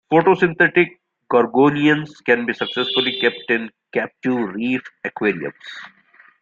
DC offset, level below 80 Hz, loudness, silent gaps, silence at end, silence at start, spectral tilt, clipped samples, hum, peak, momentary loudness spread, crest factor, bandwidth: under 0.1%; -62 dBFS; -19 LUFS; none; 0.55 s; 0.1 s; -6.5 dB/octave; under 0.1%; none; -2 dBFS; 12 LU; 18 dB; 7.4 kHz